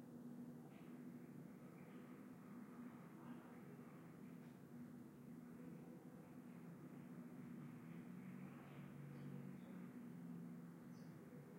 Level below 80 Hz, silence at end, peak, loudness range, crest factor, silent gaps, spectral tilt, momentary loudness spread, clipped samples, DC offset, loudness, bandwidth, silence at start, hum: under -90 dBFS; 0 s; -44 dBFS; 3 LU; 14 dB; none; -7.5 dB/octave; 4 LU; under 0.1%; under 0.1%; -58 LUFS; 16 kHz; 0 s; none